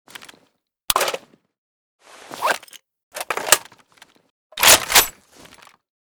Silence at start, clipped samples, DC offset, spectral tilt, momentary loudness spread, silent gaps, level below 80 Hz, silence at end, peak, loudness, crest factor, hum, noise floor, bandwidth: 0.9 s; under 0.1%; under 0.1%; 1 dB/octave; 23 LU; 1.58-1.99 s, 3.03-3.11 s, 4.30-4.50 s; -52 dBFS; 0.95 s; 0 dBFS; -16 LUFS; 22 dB; none; -65 dBFS; over 20 kHz